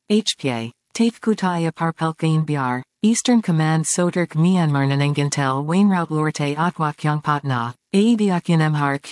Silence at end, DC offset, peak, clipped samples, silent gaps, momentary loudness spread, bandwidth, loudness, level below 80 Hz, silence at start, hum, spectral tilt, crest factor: 0 s; under 0.1%; -6 dBFS; under 0.1%; none; 5 LU; 12 kHz; -20 LUFS; -70 dBFS; 0.1 s; none; -5.5 dB/octave; 14 dB